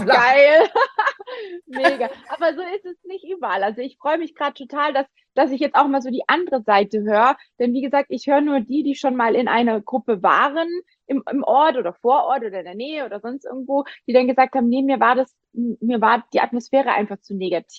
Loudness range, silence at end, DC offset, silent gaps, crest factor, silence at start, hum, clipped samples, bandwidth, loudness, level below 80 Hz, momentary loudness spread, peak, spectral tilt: 5 LU; 0 s; under 0.1%; none; 18 dB; 0 s; none; under 0.1%; 9.8 kHz; -19 LUFS; -70 dBFS; 12 LU; -2 dBFS; -5.5 dB/octave